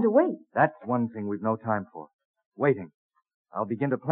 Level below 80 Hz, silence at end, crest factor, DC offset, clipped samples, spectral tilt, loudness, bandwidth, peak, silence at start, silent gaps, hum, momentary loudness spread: -80 dBFS; 0 s; 20 dB; under 0.1%; under 0.1%; -8.5 dB/octave; -28 LUFS; 3.9 kHz; -8 dBFS; 0 s; 2.13-2.19 s, 2.25-2.34 s, 2.46-2.52 s, 2.94-3.10 s, 3.34-3.45 s; none; 14 LU